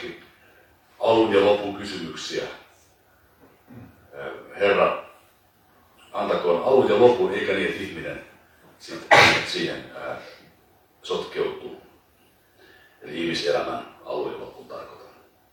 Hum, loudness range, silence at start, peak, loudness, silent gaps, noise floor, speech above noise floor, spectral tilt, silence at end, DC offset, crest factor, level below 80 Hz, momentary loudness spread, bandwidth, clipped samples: none; 11 LU; 0 s; 0 dBFS; -22 LUFS; none; -59 dBFS; 37 dB; -4 dB/octave; 0.5 s; under 0.1%; 26 dB; -62 dBFS; 22 LU; 18.5 kHz; under 0.1%